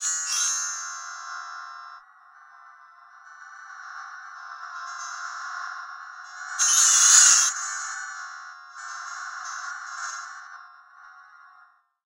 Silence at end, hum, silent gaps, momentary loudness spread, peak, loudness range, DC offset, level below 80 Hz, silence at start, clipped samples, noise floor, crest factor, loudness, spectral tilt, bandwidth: 0.6 s; none; none; 25 LU; -2 dBFS; 22 LU; under 0.1%; -86 dBFS; 0 s; under 0.1%; -58 dBFS; 26 dB; -20 LUFS; 6.5 dB/octave; 16 kHz